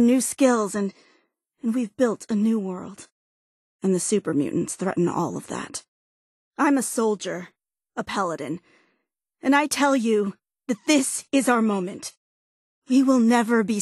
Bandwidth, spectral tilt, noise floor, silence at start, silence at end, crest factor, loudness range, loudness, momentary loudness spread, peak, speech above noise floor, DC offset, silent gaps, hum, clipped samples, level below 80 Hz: 12.5 kHz; -4.5 dB/octave; -76 dBFS; 0 s; 0 s; 18 dB; 5 LU; -23 LUFS; 15 LU; -6 dBFS; 54 dB; under 0.1%; 3.12-3.79 s, 5.88-6.51 s, 12.17-12.82 s; none; under 0.1%; -68 dBFS